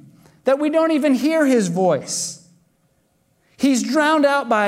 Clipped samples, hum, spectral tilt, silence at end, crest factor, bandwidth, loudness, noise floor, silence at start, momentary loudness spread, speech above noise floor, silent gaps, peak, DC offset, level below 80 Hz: under 0.1%; none; -4.5 dB/octave; 0 s; 14 dB; 15.5 kHz; -18 LUFS; -63 dBFS; 0.45 s; 8 LU; 46 dB; none; -6 dBFS; under 0.1%; -70 dBFS